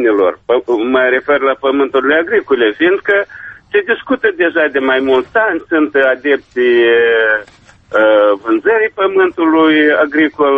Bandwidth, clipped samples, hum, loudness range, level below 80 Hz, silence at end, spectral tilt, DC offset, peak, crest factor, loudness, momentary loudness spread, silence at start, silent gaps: 5.8 kHz; under 0.1%; none; 2 LU; -52 dBFS; 0 s; -6 dB/octave; under 0.1%; 0 dBFS; 12 dB; -12 LUFS; 5 LU; 0 s; none